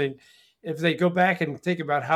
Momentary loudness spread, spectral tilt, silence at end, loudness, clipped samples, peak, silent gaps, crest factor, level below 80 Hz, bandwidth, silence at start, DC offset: 11 LU; -6.5 dB/octave; 0 s; -25 LUFS; under 0.1%; -6 dBFS; none; 18 dB; -70 dBFS; 13.5 kHz; 0 s; under 0.1%